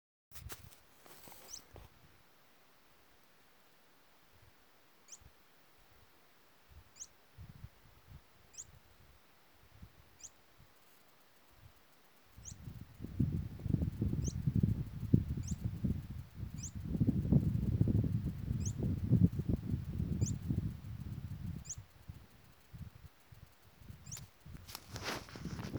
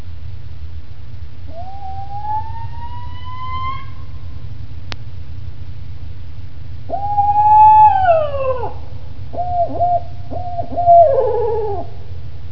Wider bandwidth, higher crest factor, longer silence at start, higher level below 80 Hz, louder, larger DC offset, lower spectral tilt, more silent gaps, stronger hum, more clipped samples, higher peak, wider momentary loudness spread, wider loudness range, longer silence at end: first, over 20 kHz vs 5.4 kHz; first, 28 dB vs 16 dB; first, 0.3 s vs 0 s; second, -50 dBFS vs -36 dBFS; second, -38 LUFS vs -15 LUFS; second, under 0.1% vs 9%; second, -6.5 dB/octave vs -8 dB/octave; neither; neither; neither; second, -12 dBFS vs 0 dBFS; about the same, 25 LU vs 24 LU; first, 23 LU vs 16 LU; about the same, 0 s vs 0 s